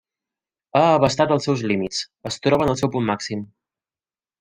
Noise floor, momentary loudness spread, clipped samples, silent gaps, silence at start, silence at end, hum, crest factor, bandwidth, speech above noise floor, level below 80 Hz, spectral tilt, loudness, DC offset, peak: under -90 dBFS; 11 LU; under 0.1%; none; 0.75 s; 0.95 s; none; 20 dB; 15 kHz; over 70 dB; -52 dBFS; -5.5 dB/octave; -20 LUFS; under 0.1%; -2 dBFS